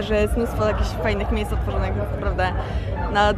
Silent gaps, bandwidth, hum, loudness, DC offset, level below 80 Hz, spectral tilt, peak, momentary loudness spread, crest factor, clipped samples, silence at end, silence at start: none; 14 kHz; none; -23 LUFS; under 0.1%; -26 dBFS; -6.5 dB/octave; -6 dBFS; 4 LU; 16 dB; under 0.1%; 0 s; 0 s